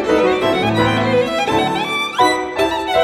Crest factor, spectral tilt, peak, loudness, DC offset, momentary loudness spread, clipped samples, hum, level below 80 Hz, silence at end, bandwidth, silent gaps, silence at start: 16 dB; -5 dB/octave; 0 dBFS; -16 LUFS; under 0.1%; 3 LU; under 0.1%; none; -44 dBFS; 0 s; 16.5 kHz; none; 0 s